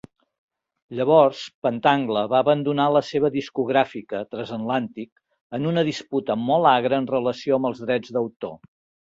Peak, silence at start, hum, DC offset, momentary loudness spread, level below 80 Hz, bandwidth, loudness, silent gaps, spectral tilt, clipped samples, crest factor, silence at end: -2 dBFS; 0.9 s; none; under 0.1%; 13 LU; -64 dBFS; 7.8 kHz; -22 LUFS; 1.55-1.62 s, 5.12-5.16 s, 5.41-5.50 s, 8.36-8.40 s; -6.5 dB/octave; under 0.1%; 20 dB; 0.45 s